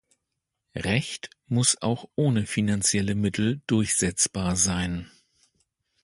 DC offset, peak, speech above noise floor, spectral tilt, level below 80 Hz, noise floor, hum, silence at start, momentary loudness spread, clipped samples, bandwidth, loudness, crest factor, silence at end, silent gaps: under 0.1%; -6 dBFS; 57 dB; -4 dB/octave; -48 dBFS; -82 dBFS; none; 0.75 s; 10 LU; under 0.1%; 11.5 kHz; -25 LUFS; 20 dB; 0.95 s; none